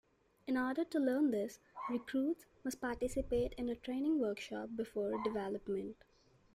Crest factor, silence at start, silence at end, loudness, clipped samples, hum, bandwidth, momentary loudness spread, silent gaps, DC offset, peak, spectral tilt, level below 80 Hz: 14 dB; 0.45 s; 0.6 s; -38 LUFS; under 0.1%; none; 15.5 kHz; 8 LU; none; under 0.1%; -24 dBFS; -5.5 dB/octave; -58 dBFS